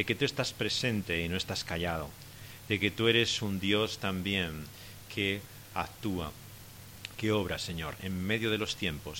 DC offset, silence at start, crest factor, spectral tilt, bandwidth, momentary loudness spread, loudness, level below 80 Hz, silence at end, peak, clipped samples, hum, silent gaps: under 0.1%; 0 s; 22 dB; -4.5 dB/octave; 17 kHz; 17 LU; -32 LUFS; -54 dBFS; 0 s; -10 dBFS; under 0.1%; none; none